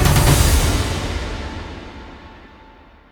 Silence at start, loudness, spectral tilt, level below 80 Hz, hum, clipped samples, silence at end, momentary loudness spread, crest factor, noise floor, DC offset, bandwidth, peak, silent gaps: 0 s; -18 LUFS; -4.5 dB/octave; -24 dBFS; none; under 0.1%; 0.7 s; 24 LU; 18 dB; -45 dBFS; under 0.1%; over 20 kHz; -2 dBFS; none